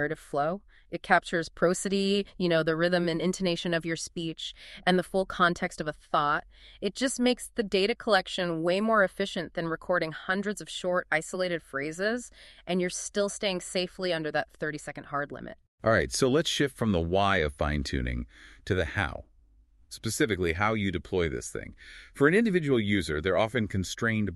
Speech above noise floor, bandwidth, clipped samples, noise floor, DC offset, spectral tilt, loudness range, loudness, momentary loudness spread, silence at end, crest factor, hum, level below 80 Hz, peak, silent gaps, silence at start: 32 dB; 13 kHz; under 0.1%; -60 dBFS; under 0.1%; -4.5 dB/octave; 4 LU; -28 LUFS; 11 LU; 0 s; 22 dB; none; -48 dBFS; -6 dBFS; 15.68-15.78 s; 0 s